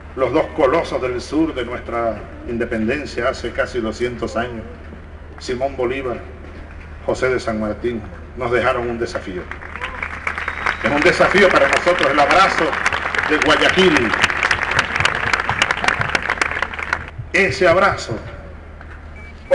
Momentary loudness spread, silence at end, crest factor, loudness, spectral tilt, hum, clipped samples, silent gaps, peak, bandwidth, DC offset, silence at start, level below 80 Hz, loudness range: 21 LU; 0 s; 16 dB; -18 LUFS; -4.5 dB/octave; none; under 0.1%; none; -4 dBFS; 11.5 kHz; under 0.1%; 0 s; -36 dBFS; 9 LU